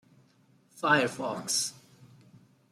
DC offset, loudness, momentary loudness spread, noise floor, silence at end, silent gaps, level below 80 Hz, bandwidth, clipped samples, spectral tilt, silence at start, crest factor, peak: under 0.1%; -28 LUFS; 10 LU; -64 dBFS; 0.65 s; none; -78 dBFS; 16 kHz; under 0.1%; -2.5 dB/octave; 0.75 s; 22 dB; -10 dBFS